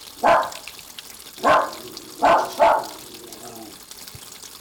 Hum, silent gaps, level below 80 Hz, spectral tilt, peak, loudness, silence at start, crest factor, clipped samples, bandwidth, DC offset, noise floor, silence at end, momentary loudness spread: none; none; -56 dBFS; -2.5 dB/octave; -4 dBFS; -19 LUFS; 0 s; 18 dB; under 0.1%; over 20 kHz; under 0.1%; -40 dBFS; 0.15 s; 19 LU